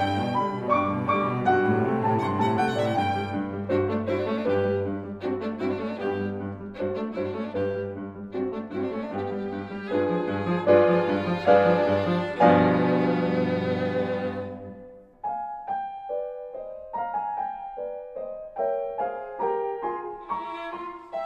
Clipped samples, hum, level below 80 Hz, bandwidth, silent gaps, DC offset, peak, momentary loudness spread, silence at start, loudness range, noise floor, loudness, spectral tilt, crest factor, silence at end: under 0.1%; none; -60 dBFS; 10 kHz; none; under 0.1%; -4 dBFS; 14 LU; 0 s; 11 LU; -46 dBFS; -26 LUFS; -8 dB/octave; 22 dB; 0 s